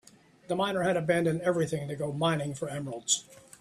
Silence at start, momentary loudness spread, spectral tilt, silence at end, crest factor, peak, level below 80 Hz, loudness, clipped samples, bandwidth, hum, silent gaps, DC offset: 0.5 s; 8 LU; -4 dB/octave; 0.2 s; 20 dB; -10 dBFS; -66 dBFS; -30 LUFS; under 0.1%; 13.5 kHz; none; none; under 0.1%